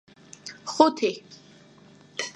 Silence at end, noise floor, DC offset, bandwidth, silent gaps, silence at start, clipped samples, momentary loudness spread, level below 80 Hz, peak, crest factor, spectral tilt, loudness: 0.05 s; -53 dBFS; under 0.1%; 11.5 kHz; none; 0.45 s; under 0.1%; 21 LU; -76 dBFS; -2 dBFS; 26 dB; -3 dB/octave; -24 LUFS